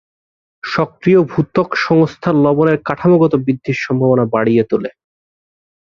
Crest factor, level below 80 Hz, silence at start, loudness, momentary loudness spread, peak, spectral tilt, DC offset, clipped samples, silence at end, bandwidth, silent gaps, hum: 14 dB; -52 dBFS; 0.65 s; -14 LUFS; 7 LU; 0 dBFS; -8 dB/octave; under 0.1%; under 0.1%; 1 s; 7.2 kHz; none; none